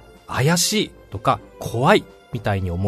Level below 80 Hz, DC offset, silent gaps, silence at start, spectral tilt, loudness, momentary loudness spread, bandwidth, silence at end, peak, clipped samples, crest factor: -46 dBFS; under 0.1%; none; 0.3 s; -4 dB/octave; -21 LUFS; 12 LU; 13.5 kHz; 0 s; 0 dBFS; under 0.1%; 20 dB